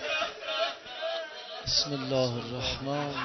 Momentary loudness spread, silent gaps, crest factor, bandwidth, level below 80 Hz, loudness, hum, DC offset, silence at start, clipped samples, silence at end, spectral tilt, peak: 10 LU; none; 20 dB; 6.4 kHz; -54 dBFS; -31 LUFS; none; under 0.1%; 0 s; under 0.1%; 0 s; -3.5 dB/octave; -12 dBFS